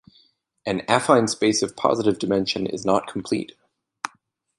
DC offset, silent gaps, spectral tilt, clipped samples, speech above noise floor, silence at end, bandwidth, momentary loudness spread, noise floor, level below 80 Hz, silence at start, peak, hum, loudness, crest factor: under 0.1%; none; -4 dB/octave; under 0.1%; 41 dB; 0.5 s; 11.5 kHz; 16 LU; -63 dBFS; -60 dBFS; 0.65 s; -2 dBFS; none; -22 LUFS; 22 dB